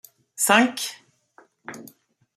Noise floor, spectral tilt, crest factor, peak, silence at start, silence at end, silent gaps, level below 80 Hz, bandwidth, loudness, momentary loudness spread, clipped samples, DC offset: -57 dBFS; -2 dB/octave; 24 dB; -2 dBFS; 0.4 s; 0.55 s; none; -74 dBFS; 15.5 kHz; -20 LUFS; 25 LU; under 0.1%; under 0.1%